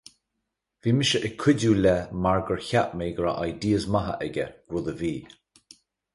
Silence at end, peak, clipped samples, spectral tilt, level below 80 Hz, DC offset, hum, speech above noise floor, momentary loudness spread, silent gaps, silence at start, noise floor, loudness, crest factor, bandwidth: 0.9 s; -8 dBFS; under 0.1%; -5.5 dB/octave; -48 dBFS; under 0.1%; none; 57 dB; 10 LU; none; 0.85 s; -81 dBFS; -25 LUFS; 18 dB; 11.5 kHz